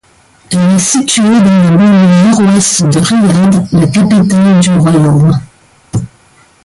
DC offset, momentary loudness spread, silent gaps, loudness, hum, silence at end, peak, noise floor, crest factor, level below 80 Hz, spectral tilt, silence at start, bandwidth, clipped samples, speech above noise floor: under 0.1%; 10 LU; none; -7 LUFS; none; 0.6 s; 0 dBFS; -44 dBFS; 8 dB; -40 dBFS; -5.5 dB/octave; 0.5 s; 11.5 kHz; under 0.1%; 38 dB